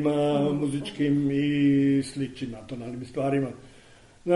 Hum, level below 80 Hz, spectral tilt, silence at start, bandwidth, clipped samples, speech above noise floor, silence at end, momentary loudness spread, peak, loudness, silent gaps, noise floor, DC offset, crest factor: none; -56 dBFS; -7 dB/octave; 0 s; 11.5 kHz; under 0.1%; 27 dB; 0 s; 15 LU; -10 dBFS; -26 LUFS; none; -53 dBFS; under 0.1%; 16 dB